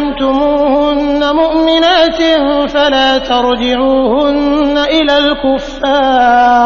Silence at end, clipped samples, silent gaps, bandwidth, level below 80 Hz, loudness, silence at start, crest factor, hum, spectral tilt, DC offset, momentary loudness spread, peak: 0 s; under 0.1%; none; 7.2 kHz; -32 dBFS; -10 LUFS; 0 s; 10 dB; none; -4 dB/octave; under 0.1%; 4 LU; 0 dBFS